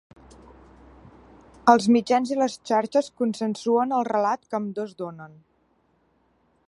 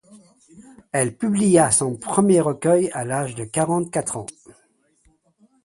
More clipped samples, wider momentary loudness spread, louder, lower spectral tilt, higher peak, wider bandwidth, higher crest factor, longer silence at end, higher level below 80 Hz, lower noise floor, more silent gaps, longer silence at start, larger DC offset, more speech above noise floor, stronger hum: neither; first, 14 LU vs 10 LU; second, -23 LUFS vs -20 LUFS; about the same, -5.5 dB/octave vs -5.5 dB/octave; about the same, -2 dBFS vs -2 dBFS; about the same, 11.5 kHz vs 11.5 kHz; about the same, 24 dB vs 20 dB; about the same, 1.4 s vs 1.35 s; about the same, -62 dBFS vs -58 dBFS; first, -66 dBFS vs -62 dBFS; neither; first, 1.65 s vs 0.1 s; neither; about the same, 43 dB vs 42 dB; neither